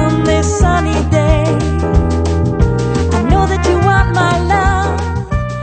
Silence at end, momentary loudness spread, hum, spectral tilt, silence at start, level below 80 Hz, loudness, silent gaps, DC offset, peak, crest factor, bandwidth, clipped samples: 0 s; 4 LU; none; -6.5 dB/octave; 0 s; -18 dBFS; -13 LUFS; none; under 0.1%; 0 dBFS; 12 dB; 9 kHz; under 0.1%